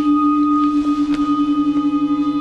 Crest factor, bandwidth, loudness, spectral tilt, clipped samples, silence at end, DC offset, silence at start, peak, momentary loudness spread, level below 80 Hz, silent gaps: 8 dB; 6.8 kHz; -17 LUFS; -6.5 dB/octave; under 0.1%; 0 s; under 0.1%; 0 s; -8 dBFS; 3 LU; -46 dBFS; none